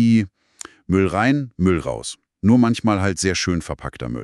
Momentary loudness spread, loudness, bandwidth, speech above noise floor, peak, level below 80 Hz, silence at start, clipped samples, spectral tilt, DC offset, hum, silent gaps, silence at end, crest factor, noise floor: 15 LU; -20 LUFS; 12 kHz; 23 dB; -4 dBFS; -42 dBFS; 0 s; under 0.1%; -5.5 dB/octave; under 0.1%; none; none; 0 s; 16 dB; -42 dBFS